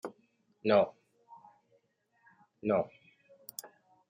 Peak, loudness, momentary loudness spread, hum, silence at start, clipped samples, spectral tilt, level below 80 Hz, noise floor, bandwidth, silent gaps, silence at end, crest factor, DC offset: -12 dBFS; -32 LUFS; 19 LU; none; 0.05 s; under 0.1%; -5.5 dB/octave; -78 dBFS; -74 dBFS; 16.5 kHz; none; 0.45 s; 24 dB; under 0.1%